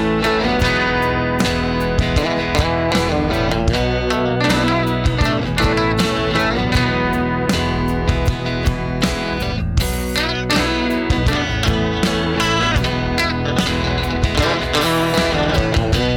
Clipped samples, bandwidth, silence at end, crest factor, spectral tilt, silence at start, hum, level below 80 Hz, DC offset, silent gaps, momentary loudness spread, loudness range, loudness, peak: under 0.1%; 19 kHz; 0 s; 12 dB; -5 dB/octave; 0 s; none; -26 dBFS; under 0.1%; none; 3 LU; 2 LU; -17 LUFS; -4 dBFS